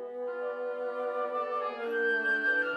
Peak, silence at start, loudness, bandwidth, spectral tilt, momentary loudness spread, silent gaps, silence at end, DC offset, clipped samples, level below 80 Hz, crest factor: -18 dBFS; 0 s; -31 LUFS; 8.4 kHz; -4 dB/octave; 8 LU; none; 0 s; under 0.1%; under 0.1%; -86 dBFS; 12 dB